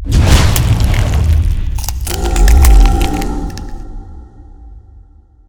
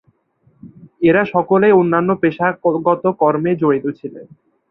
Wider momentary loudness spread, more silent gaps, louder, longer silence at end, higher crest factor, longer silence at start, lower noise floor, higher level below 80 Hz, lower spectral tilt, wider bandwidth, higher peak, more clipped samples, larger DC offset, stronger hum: first, 19 LU vs 7 LU; neither; about the same, -13 LUFS vs -15 LUFS; about the same, 0.5 s vs 0.45 s; about the same, 12 dB vs 14 dB; second, 0 s vs 0.65 s; second, -41 dBFS vs -58 dBFS; first, -12 dBFS vs -58 dBFS; second, -5 dB/octave vs -11 dB/octave; first, over 20 kHz vs 4.1 kHz; about the same, 0 dBFS vs -2 dBFS; first, 0.5% vs under 0.1%; neither; neither